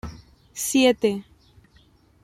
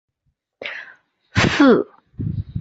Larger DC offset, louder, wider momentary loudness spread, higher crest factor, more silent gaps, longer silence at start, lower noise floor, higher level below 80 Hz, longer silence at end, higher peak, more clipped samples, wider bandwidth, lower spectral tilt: neither; second, -22 LUFS vs -17 LUFS; first, 21 LU vs 18 LU; about the same, 20 dB vs 18 dB; neither; second, 0.05 s vs 0.6 s; second, -57 dBFS vs -71 dBFS; second, -52 dBFS vs -40 dBFS; first, 1 s vs 0 s; second, -6 dBFS vs -2 dBFS; neither; first, 16 kHz vs 8 kHz; second, -3.5 dB/octave vs -6 dB/octave